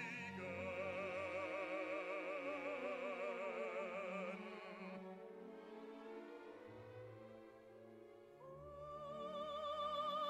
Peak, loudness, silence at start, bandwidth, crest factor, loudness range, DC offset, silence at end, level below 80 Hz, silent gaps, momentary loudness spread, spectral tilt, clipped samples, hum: -34 dBFS; -47 LUFS; 0 s; 13.5 kHz; 14 dB; 12 LU; under 0.1%; 0 s; -80 dBFS; none; 14 LU; -5.5 dB/octave; under 0.1%; none